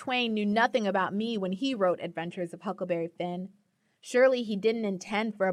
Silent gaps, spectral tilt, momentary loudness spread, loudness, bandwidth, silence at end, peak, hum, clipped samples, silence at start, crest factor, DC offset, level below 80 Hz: none; -5.5 dB/octave; 11 LU; -29 LUFS; 11.5 kHz; 0 s; -12 dBFS; none; under 0.1%; 0 s; 16 dB; under 0.1%; -76 dBFS